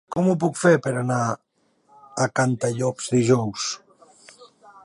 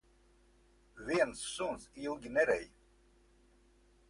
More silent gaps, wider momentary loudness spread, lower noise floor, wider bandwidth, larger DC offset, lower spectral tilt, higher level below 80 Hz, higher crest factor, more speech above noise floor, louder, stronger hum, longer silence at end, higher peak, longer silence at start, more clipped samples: neither; about the same, 10 LU vs 12 LU; second, -61 dBFS vs -67 dBFS; about the same, 11.5 kHz vs 11.5 kHz; neither; first, -5.5 dB/octave vs -3.5 dB/octave; about the same, -62 dBFS vs -64 dBFS; about the same, 18 dB vs 22 dB; first, 40 dB vs 32 dB; first, -22 LUFS vs -36 LUFS; neither; second, 0.4 s vs 1.45 s; first, -4 dBFS vs -18 dBFS; second, 0.1 s vs 0.95 s; neither